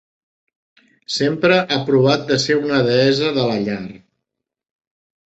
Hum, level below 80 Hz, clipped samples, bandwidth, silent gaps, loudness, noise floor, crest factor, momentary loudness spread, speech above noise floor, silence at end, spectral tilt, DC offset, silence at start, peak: none; -56 dBFS; under 0.1%; 8.2 kHz; none; -17 LUFS; -82 dBFS; 18 dB; 10 LU; 65 dB; 1.4 s; -5 dB/octave; under 0.1%; 1.1 s; -2 dBFS